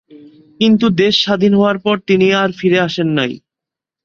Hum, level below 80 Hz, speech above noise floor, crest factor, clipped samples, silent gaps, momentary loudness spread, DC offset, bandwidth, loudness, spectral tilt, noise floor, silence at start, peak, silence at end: none; -54 dBFS; 73 dB; 14 dB; under 0.1%; none; 5 LU; under 0.1%; 7.2 kHz; -13 LUFS; -6 dB/octave; -85 dBFS; 0.15 s; 0 dBFS; 0.65 s